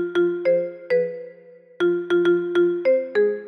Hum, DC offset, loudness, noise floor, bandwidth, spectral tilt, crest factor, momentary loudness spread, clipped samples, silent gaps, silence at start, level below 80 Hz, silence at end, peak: none; under 0.1%; -21 LUFS; -47 dBFS; 6.2 kHz; -7 dB/octave; 12 dB; 6 LU; under 0.1%; none; 0 s; -72 dBFS; 0 s; -10 dBFS